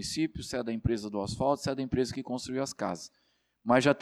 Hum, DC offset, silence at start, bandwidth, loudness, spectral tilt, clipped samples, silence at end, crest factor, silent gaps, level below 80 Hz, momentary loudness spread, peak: none; under 0.1%; 0 s; 13.5 kHz; -32 LUFS; -5 dB/octave; under 0.1%; 0 s; 18 dB; none; -52 dBFS; 9 LU; -12 dBFS